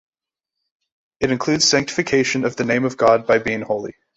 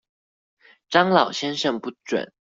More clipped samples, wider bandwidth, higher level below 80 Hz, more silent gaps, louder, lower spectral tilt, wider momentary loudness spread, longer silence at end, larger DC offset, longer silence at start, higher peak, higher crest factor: neither; about the same, 8.2 kHz vs 7.8 kHz; first, -54 dBFS vs -68 dBFS; neither; first, -18 LUFS vs -22 LUFS; about the same, -3.5 dB/octave vs -4.5 dB/octave; about the same, 8 LU vs 10 LU; about the same, 0.25 s vs 0.15 s; neither; first, 1.2 s vs 0.9 s; about the same, -2 dBFS vs -2 dBFS; about the same, 18 dB vs 22 dB